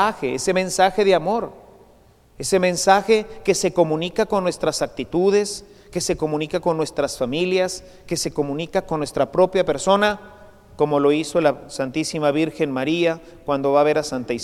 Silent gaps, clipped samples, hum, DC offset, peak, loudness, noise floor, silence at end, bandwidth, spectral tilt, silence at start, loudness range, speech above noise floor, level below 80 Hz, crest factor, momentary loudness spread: none; under 0.1%; none; under 0.1%; 0 dBFS; -20 LUFS; -52 dBFS; 0 s; 15.5 kHz; -4.5 dB/octave; 0 s; 3 LU; 32 dB; -50 dBFS; 20 dB; 8 LU